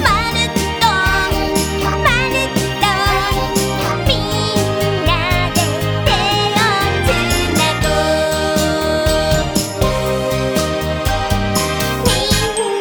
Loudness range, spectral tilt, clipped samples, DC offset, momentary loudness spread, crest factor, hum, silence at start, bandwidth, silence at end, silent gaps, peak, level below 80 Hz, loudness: 2 LU; -4 dB/octave; under 0.1%; 0.2%; 4 LU; 16 dB; none; 0 s; over 20 kHz; 0 s; none; 0 dBFS; -26 dBFS; -15 LUFS